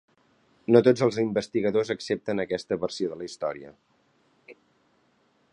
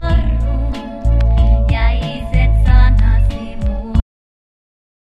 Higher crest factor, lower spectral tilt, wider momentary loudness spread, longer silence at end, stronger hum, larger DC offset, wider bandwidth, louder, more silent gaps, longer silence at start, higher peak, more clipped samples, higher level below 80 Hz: first, 24 dB vs 14 dB; second, -6 dB/octave vs -8 dB/octave; first, 13 LU vs 10 LU; about the same, 1 s vs 1.1 s; neither; neither; first, 10.5 kHz vs 5.2 kHz; second, -26 LUFS vs -16 LUFS; neither; first, 0.7 s vs 0 s; second, -4 dBFS vs 0 dBFS; neither; second, -66 dBFS vs -14 dBFS